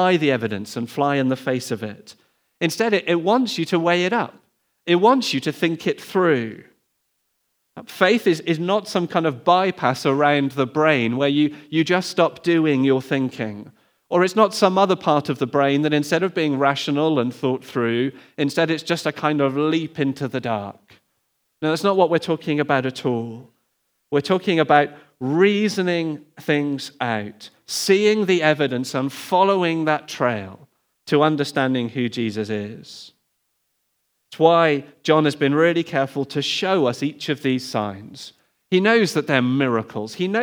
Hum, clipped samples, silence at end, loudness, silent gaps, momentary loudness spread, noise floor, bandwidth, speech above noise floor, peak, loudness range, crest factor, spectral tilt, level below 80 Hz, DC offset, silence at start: none; under 0.1%; 0 s; -20 LUFS; none; 10 LU; -71 dBFS; over 20 kHz; 51 dB; 0 dBFS; 4 LU; 20 dB; -5.5 dB/octave; -76 dBFS; under 0.1%; 0 s